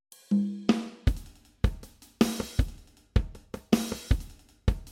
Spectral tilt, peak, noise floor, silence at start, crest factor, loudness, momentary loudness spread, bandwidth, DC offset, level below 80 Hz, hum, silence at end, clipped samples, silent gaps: -6 dB/octave; -8 dBFS; -46 dBFS; 0.3 s; 22 dB; -30 LUFS; 12 LU; 16.5 kHz; under 0.1%; -34 dBFS; none; 0 s; under 0.1%; none